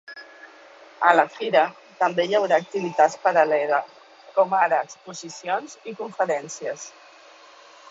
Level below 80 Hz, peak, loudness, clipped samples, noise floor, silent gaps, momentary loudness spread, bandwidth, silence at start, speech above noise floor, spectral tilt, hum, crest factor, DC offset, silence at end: -74 dBFS; -2 dBFS; -22 LUFS; under 0.1%; -49 dBFS; none; 18 LU; 8 kHz; 0.1 s; 27 dB; -3.5 dB/octave; none; 22 dB; under 0.1%; 1 s